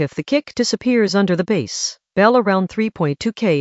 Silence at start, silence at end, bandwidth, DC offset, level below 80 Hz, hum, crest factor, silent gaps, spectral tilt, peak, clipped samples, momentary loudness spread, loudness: 0 s; 0 s; 8.2 kHz; under 0.1%; -56 dBFS; none; 18 dB; none; -5 dB/octave; 0 dBFS; under 0.1%; 7 LU; -18 LUFS